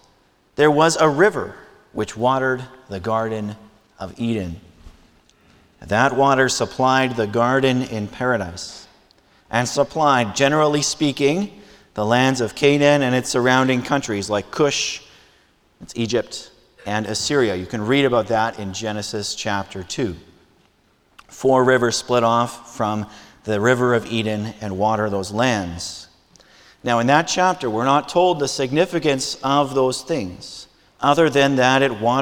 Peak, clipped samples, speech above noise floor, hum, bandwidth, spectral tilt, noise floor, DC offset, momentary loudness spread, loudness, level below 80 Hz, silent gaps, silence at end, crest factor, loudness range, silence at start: 0 dBFS; under 0.1%; 40 dB; none; 18 kHz; -4.5 dB/octave; -60 dBFS; under 0.1%; 15 LU; -19 LUFS; -52 dBFS; none; 0 s; 20 dB; 6 LU; 0.6 s